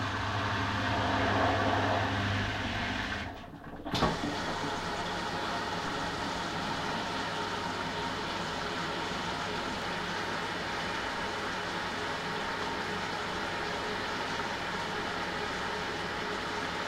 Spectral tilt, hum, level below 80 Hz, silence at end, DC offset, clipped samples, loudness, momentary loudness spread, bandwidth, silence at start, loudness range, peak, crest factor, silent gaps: -4 dB/octave; none; -50 dBFS; 0 s; under 0.1%; under 0.1%; -33 LUFS; 5 LU; 16 kHz; 0 s; 3 LU; -14 dBFS; 20 dB; none